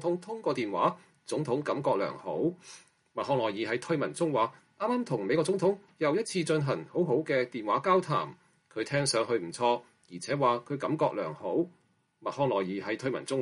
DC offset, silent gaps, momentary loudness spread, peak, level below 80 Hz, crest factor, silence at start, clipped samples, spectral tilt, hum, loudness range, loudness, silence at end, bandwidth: under 0.1%; none; 9 LU; -12 dBFS; -74 dBFS; 18 dB; 0 s; under 0.1%; -5.5 dB/octave; none; 3 LU; -30 LUFS; 0 s; 11.5 kHz